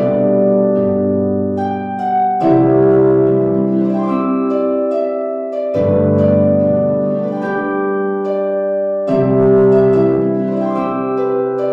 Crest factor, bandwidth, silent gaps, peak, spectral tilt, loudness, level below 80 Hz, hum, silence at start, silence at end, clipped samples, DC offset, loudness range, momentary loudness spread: 12 dB; 5.4 kHz; none; -2 dBFS; -10.5 dB/octave; -14 LUFS; -48 dBFS; none; 0 s; 0 s; under 0.1%; under 0.1%; 2 LU; 7 LU